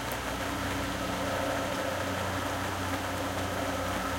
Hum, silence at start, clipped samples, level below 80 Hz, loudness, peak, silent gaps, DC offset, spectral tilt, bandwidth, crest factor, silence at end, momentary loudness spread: none; 0 s; under 0.1%; -48 dBFS; -32 LUFS; -18 dBFS; none; under 0.1%; -4 dB/octave; 16.5 kHz; 14 dB; 0 s; 2 LU